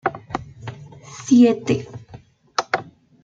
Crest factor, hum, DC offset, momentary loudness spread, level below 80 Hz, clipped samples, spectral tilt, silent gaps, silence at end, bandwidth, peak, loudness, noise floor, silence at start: 20 dB; none; under 0.1%; 24 LU; -56 dBFS; under 0.1%; -5.5 dB/octave; none; 0.4 s; 7.6 kHz; -2 dBFS; -20 LUFS; -45 dBFS; 0.05 s